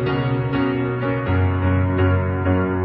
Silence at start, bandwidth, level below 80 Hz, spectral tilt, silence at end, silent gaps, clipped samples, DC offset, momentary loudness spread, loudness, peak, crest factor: 0 s; 4.9 kHz; -38 dBFS; -11.5 dB/octave; 0 s; none; under 0.1%; under 0.1%; 3 LU; -20 LUFS; -6 dBFS; 12 dB